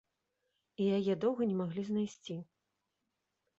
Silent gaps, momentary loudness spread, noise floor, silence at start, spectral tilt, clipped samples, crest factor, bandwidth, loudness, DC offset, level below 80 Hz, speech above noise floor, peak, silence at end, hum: none; 13 LU; -85 dBFS; 0.8 s; -7.5 dB/octave; under 0.1%; 16 dB; 7.8 kHz; -35 LUFS; under 0.1%; -76 dBFS; 52 dB; -20 dBFS; 1.15 s; none